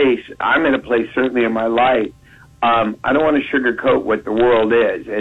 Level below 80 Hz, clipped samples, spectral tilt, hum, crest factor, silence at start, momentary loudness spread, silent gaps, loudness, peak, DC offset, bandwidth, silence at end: -48 dBFS; under 0.1%; -7 dB/octave; none; 12 dB; 0 s; 5 LU; none; -16 LUFS; -4 dBFS; under 0.1%; 7.6 kHz; 0 s